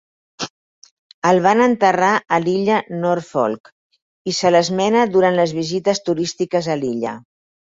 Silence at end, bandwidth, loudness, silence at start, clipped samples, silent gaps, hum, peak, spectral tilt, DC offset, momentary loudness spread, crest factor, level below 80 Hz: 0.55 s; 8 kHz; -17 LUFS; 0.4 s; under 0.1%; 0.50-0.82 s, 0.91-1.22 s, 3.60-3.64 s, 3.72-3.90 s, 4.02-4.25 s; none; -2 dBFS; -5 dB/octave; under 0.1%; 14 LU; 16 dB; -62 dBFS